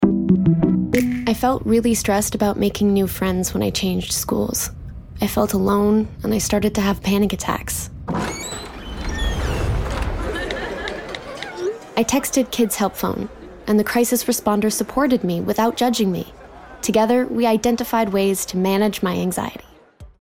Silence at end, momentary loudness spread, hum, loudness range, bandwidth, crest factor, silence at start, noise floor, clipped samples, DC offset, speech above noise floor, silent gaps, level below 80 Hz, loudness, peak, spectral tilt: 0.15 s; 11 LU; none; 6 LU; 18.5 kHz; 18 dB; 0 s; -44 dBFS; under 0.1%; under 0.1%; 25 dB; none; -34 dBFS; -20 LUFS; -2 dBFS; -5 dB/octave